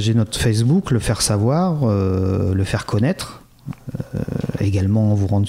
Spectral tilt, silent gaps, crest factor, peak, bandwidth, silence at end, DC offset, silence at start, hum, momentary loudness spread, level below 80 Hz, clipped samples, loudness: -6 dB/octave; none; 12 dB; -6 dBFS; 15.5 kHz; 0 s; under 0.1%; 0 s; none; 13 LU; -38 dBFS; under 0.1%; -19 LUFS